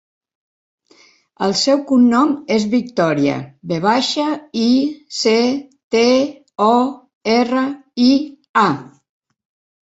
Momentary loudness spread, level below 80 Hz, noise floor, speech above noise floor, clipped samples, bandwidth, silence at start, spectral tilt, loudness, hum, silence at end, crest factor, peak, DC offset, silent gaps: 9 LU; -60 dBFS; -52 dBFS; 36 dB; under 0.1%; 8 kHz; 1.4 s; -4.5 dB/octave; -17 LUFS; none; 0.95 s; 16 dB; -2 dBFS; under 0.1%; 5.84-5.90 s, 7.15-7.21 s, 8.49-8.54 s